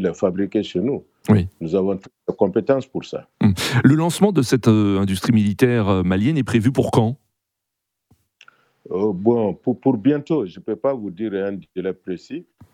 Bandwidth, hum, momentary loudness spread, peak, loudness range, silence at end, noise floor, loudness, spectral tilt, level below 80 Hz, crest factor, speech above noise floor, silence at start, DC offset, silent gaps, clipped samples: 15.5 kHz; none; 11 LU; 0 dBFS; 6 LU; 0.3 s; -80 dBFS; -20 LUFS; -7 dB/octave; -58 dBFS; 20 dB; 61 dB; 0 s; under 0.1%; none; under 0.1%